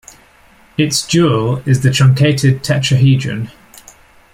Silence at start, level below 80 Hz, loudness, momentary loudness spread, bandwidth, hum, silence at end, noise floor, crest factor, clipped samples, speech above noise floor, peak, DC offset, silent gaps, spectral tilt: 0.8 s; -46 dBFS; -13 LUFS; 12 LU; 15 kHz; none; 0.85 s; -47 dBFS; 14 dB; under 0.1%; 34 dB; 0 dBFS; under 0.1%; none; -5.5 dB/octave